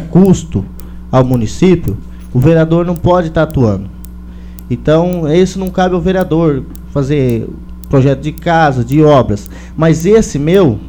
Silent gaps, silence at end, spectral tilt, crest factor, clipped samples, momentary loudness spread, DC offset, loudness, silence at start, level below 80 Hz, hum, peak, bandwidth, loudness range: none; 0 s; -7.5 dB/octave; 12 dB; 0.3%; 17 LU; under 0.1%; -12 LUFS; 0 s; -28 dBFS; none; 0 dBFS; over 20 kHz; 2 LU